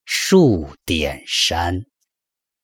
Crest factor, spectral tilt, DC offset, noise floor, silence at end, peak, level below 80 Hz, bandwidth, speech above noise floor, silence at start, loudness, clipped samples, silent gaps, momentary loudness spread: 18 dB; -4 dB/octave; under 0.1%; -84 dBFS; 0.8 s; -2 dBFS; -42 dBFS; 18.5 kHz; 67 dB; 0.05 s; -18 LUFS; under 0.1%; none; 10 LU